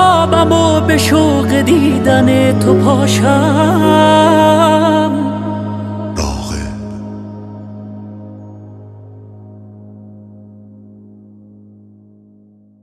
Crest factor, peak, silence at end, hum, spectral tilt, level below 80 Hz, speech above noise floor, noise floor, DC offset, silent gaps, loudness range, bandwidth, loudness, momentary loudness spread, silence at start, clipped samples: 12 dB; 0 dBFS; 2.55 s; none; -5.5 dB/octave; -36 dBFS; 37 dB; -46 dBFS; under 0.1%; none; 21 LU; 15 kHz; -11 LUFS; 21 LU; 0 s; under 0.1%